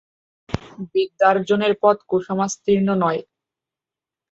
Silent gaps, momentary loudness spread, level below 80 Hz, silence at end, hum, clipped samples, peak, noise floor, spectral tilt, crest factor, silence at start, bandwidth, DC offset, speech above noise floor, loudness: none; 13 LU; -52 dBFS; 1.1 s; none; under 0.1%; -2 dBFS; -89 dBFS; -5.5 dB/octave; 20 dB; 0.5 s; 8 kHz; under 0.1%; 70 dB; -20 LUFS